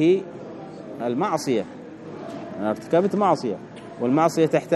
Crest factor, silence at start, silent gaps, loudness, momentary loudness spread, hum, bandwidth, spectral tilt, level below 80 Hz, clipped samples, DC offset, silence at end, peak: 18 dB; 0 s; none; -23 LUFS; 18 LU; none; 13 kHz; -6.5 dB/octave; -68 dBFS; under 0.1%; under 0.1%; 0 s; -6 dBFS